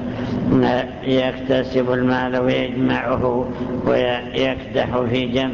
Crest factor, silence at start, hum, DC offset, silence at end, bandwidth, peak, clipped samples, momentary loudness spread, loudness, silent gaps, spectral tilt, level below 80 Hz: 14 dB; 0 s; none; under 0.1%; 0 s; 7 kHz; -6 dBFS; under 0.1%; 4 LU; -20 LUFS; none; -7.5 dB/octave; -40 dBFS